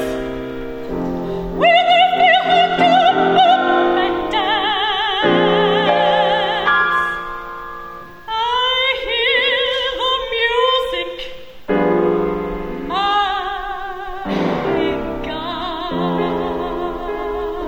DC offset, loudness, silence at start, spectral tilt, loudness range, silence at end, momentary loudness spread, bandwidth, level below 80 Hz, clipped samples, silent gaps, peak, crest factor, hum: under 0.1%; -16 LUFS; 0 s; -5 dB/octave; 8 LU; 0 s; 14 LU; 16 kHz; -40 dBFS; under 0.1%; none; -2 dBFS; 14 dB; none